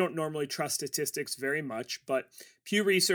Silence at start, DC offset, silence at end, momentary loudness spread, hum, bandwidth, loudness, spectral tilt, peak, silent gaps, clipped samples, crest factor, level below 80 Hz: 0 s; under 0.1%; 0 s; 9 LU; none; over 20 kHz; -31 LUFS; -3 dB/octave; -14 dBFS; none; under 0.1%; 18 dB; -82 dBFS